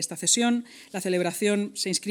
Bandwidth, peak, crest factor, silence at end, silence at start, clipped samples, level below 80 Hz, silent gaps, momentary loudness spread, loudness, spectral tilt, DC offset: 20 kHz; -10 dBFS; 18 dB; 0 s; 0 s; under 0.1%; -80 dBFS; none; 9 LU; -25 LUFS; -3 dB/octave; under 0.1%